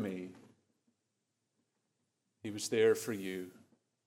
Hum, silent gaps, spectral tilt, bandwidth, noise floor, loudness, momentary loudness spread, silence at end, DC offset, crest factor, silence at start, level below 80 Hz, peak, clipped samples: none; none; -4 dB/octave; 16 kHz; -85 dBFS; -35 LUFS; 19 LU; 0.5 s; under 0.1%; 20 dB; 0 s; under -90 dBFS; -18 dBFS; under 0.1%